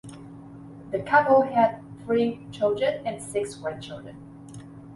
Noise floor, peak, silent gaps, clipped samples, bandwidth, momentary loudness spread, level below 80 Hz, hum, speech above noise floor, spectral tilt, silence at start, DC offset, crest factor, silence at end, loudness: -43 dBFS; -6 dBFS; none; under 0.1%; 11.5 kHz; 24 LU; -60 dBFS; none; 19 dB; -5.5 dB/octave; 0.05 s; under 0.1%; 20 dB; 0 s; -24 LUFS